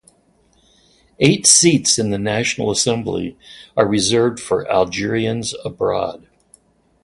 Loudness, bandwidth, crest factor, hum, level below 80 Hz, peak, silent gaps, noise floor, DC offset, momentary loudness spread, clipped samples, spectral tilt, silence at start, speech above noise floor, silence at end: -16 LUFS; 11.5 kHz; 18 dB; none; -50 dBFS; 0 dBFS; none; -57 dBFS; under 0.1%; 14 LU; under 0.1%; -3.5 dB/octave; 1.2 s; 40 dB; 0.85 s